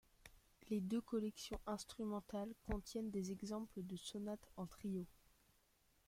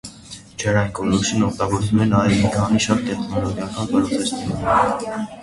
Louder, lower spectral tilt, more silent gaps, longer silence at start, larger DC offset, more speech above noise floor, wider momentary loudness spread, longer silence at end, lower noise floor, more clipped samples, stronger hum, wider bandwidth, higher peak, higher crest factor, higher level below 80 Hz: second, -47 LUFS vs -20 LUFS; about the same, -6 dB/octave vs -5.5 dB/octave; neither; first, 0.25 s vs 0.05 s; neither; first, 31 dB vs 21 dB; about the same, 8 LU vs 9 LU; first, 0.95 s vs 0 s; first, -77 dBFS vs -40 dBFS; neither; neither; first, 16.5 kHz vs 11.5 kHz; second, -28 dBFS vs -2 dBFS; about the same, 20 dB vs 18 dB; second, -62 dBFS vs -42 dBFS